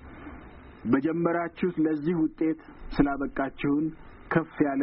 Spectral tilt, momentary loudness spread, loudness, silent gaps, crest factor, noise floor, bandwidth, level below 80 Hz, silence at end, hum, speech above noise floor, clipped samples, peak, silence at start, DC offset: -7 dB/octave; 17 LU; -28 LUFS; none; 18 dB; -46 dBFS; 5.4 kHz; -46 dBFS; 0 s; none; 20 dB; under 0.1%; -10 dBFS; 0 s; under 0.1%